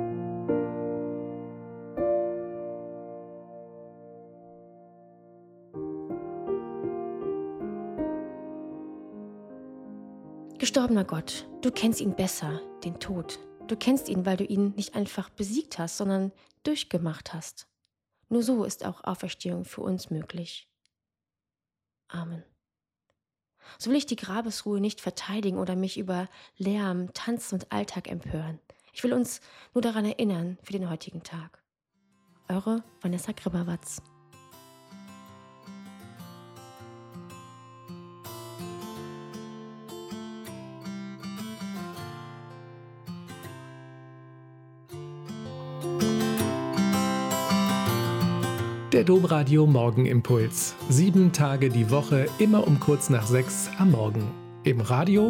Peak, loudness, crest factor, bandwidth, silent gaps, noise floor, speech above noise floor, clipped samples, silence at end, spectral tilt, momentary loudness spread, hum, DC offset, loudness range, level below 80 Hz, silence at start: -10 dBFS; -28 LUFS; 20 dB; 16.5 kHz; none; under -90 dBFS; over 64 dB; under 0.1%; 0 s; -6 dB/octave; 23 LU; none; under 0.1%; 20 LU; -62 dBFS; 0 s